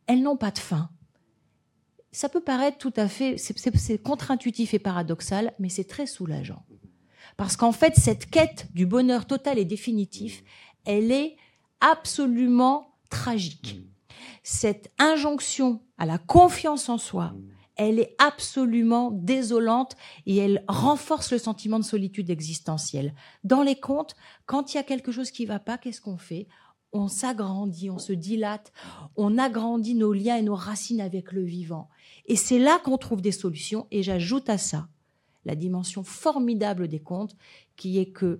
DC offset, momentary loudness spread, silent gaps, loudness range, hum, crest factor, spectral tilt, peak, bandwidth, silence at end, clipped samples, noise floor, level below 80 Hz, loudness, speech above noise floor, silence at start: under 0.1%; 15 LU; none; 7 LU; none; 24 dB; -5 dB/octave; -2 dBFS; 16 kHz; 0 s; under 0.1%; -70 dBFS; -52 dBFS; -25 LUFS; 45 dB; 0.1 s